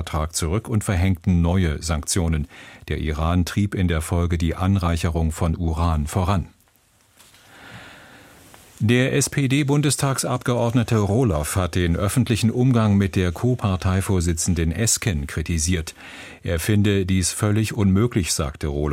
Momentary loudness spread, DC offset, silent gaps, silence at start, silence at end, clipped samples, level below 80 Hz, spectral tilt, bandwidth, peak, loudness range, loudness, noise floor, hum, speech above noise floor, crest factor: 7 LU; under 0.1%; none; 0 s; 0 s; under 0.1%; -34 dBFS; -5.5 dB/octave; 16.5 kHz; -6 dBFS; 5 LU; -21 LUFS; -59 dBFS; none; 38 dB; 16 dB